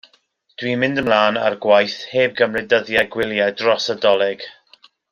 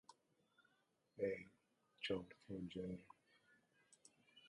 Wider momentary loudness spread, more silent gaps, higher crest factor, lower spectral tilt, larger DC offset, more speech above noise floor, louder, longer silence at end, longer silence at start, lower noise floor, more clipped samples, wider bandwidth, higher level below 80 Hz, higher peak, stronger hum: second, 7 LU vs 23 LU; neither; second, 16 dB vs 22 dB; about the same, -4.5 dB/octave vs -5.5 dB/octave; neither; first, 43 dB vs 35 dB; first, -18 LUFS vs -49 LUFS; first, 0.6 s vs 0 s; first, 0.6 s vs 0.1 s; second, -60 dBFS vs -83 dBFS; neither; first, 15.5 kHz vs 11 kHz; first, -58 dBFS vs -78 dBFS; first, -2 dBFS vs -30 dBFS; neither